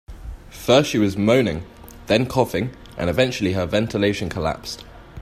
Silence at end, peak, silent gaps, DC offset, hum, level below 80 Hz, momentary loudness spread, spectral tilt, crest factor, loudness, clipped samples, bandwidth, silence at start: 0 s; -2 dBFS; none; under 0.1%; none; -42 dBFS; 21 LU; -5.5 dB/octave; 18 dB; -21 LUFS; under 0.1%; 15.5 kHz; 0.1 s